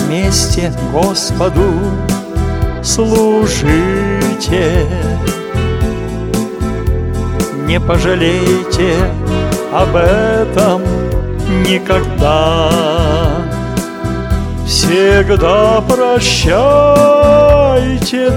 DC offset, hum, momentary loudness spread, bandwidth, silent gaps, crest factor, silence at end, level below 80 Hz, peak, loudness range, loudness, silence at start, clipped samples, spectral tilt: under 0.1%; none; 9 LU; 18.5 kHz; none; 12 dB; 0 s; -20 dBFS; 0 dBFS; 6 LU; -12 LUFS; 0 s; 0.2%; -5 dB/octave